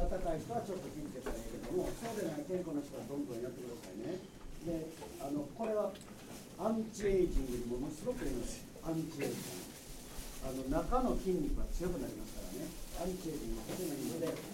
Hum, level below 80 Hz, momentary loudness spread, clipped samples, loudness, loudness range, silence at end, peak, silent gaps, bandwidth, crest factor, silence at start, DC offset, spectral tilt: none; -46 dBFS; 11 LU; under 0.1%; -40 LUFS; 4 LU; 0 s; -20 dBFS; none; 16 kHz; 20 dB; 0 s; under 0.1%; -5.5 dB/octave